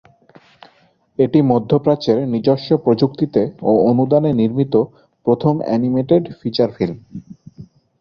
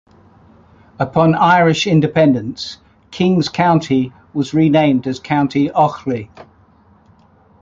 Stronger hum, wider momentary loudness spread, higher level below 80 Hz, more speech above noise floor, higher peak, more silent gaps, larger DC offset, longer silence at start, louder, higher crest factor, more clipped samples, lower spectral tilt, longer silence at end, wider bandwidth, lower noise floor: neither; second, 9 LU vs 13 LU; about the same, -54 dBFS vs -50 dBFS; first, 40 dB vs 36 dB; about the same, -2 dBFS vs -2 dBFS; neither; neither; first, 1.2 s vs 1 s; about the same, -17 LUFS vs -15 LUFS; about the same, 16 dB vs 14 dB; neither; first, -9.5 dB/octave vs -6.5 dB/octave; second, 0.35 s vs 1.2 s; second, 6.6 kHz vs 7.8 kHz; first, -56 dBFS vs -50 dBFS